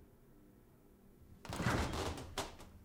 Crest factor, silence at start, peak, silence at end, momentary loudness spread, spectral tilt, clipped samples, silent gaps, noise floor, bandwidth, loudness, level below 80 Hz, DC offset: 22 dB; 0 s; -22 dBFS; 0 s; 16 LU; -4.5 dB/octave; under 0.1%; none; -64 dBFS; 17.5 kHz; -41 LUFS; -54 dBFS; under 0.1%